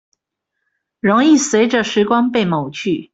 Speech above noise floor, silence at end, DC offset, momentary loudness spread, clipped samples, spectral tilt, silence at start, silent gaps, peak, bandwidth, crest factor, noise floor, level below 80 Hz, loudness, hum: 62 dB; 0.1 s; under 0.1%; 9 LU; under 0.1%; -4.5 dB/octave; 1.05 s; none; -2 dBFS; 8.2 kHz; 14 dB; -76 dBFS; -58 dBFS; -15 LUFS; none